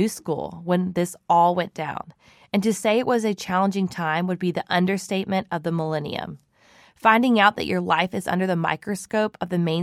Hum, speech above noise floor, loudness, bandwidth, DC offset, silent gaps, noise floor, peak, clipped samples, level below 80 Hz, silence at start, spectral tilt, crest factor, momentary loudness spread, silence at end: none; 32 dB; -23 LUFS; 15 kHz; under 0.1%; none; -55 dBFS; -2 dBFS; under 0.1%; -60 dBFS; 0 s; -5.5 dB/octave; 20 dB; 11 LU; 0 s